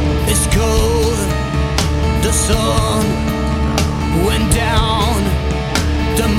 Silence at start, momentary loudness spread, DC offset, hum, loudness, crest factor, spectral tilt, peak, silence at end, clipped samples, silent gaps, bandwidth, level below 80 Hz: 0 s; 4 LU; under 0.1%; none; -15 LUFS; 14 dB; -4.5 dB/octave; 0 dBFS; 0 s; under 0.1%; none; 16 kHz; -20 dBFS